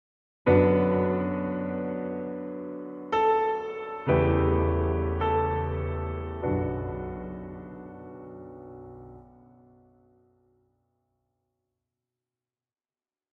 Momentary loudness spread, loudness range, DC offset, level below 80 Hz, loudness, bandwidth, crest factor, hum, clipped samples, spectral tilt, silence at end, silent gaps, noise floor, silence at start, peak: 21 LU; 20 LU; under 0.1%; -42 dBFS; -27 LUFS; 5.8 kHz; 20 dB; none; under 0.1%; -10 dB/octave; 4.1 s; none; under -90 dBFS; 0.45 s; -10 dBFS